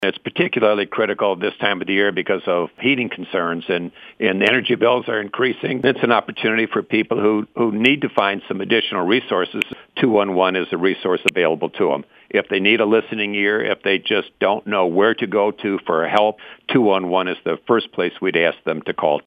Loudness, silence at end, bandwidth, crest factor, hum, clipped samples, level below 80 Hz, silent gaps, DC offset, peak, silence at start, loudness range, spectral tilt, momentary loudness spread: -19 LUFS; 0.05 s; 9.4 kHz; 18 dB; none; under 0.1%; -68 dBFS; none; under 0.1%; 0 dBFS; 0 s; 1 LU; -6 dB/octave; 6 LU